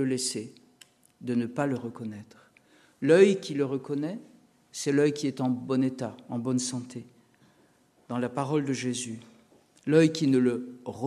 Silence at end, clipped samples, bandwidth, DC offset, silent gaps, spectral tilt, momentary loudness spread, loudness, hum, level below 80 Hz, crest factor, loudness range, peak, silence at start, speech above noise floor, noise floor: 0 s; under 0.1%; 13 kHz; under 0.1%; none; -5.5 dB/octave; 18 LU; -27 LUFS; none; -76 dBFS; 22 dB; 6 LU; -8 dBFS; 0 s; 36 dB; -63 dBFS